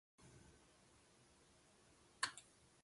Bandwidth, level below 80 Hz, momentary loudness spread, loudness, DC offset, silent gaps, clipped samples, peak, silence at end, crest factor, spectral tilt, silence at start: 11.5 kHz; -80 dBFS; 24 LU; -47 LUFS; under 0.1%; none; under 0.1%; -26 dBFS; 0 s; 30 dB; -0.5 dB/octave; 0.2 s